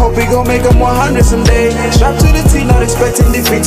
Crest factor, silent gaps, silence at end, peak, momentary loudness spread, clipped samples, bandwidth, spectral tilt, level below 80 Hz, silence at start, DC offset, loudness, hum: 8 dB; none; 0 s; 0 dBFS; 2 LU; under 0.1%; 16 kHz; -5.5 dB/octave; -12 dBFS; 0 s; under 0.1%; -10 LUFS; none